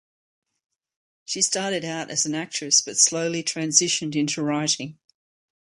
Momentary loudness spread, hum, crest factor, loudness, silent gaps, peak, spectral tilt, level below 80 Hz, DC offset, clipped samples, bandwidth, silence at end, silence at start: 8 LU; none; 24 dB; -22 LUFS; none; -2 dBFS; -2 dB/octave; -72 dBFS; under 0.1%; under 0.1%; 11.5 kHz; 0.7 s; 1.3 s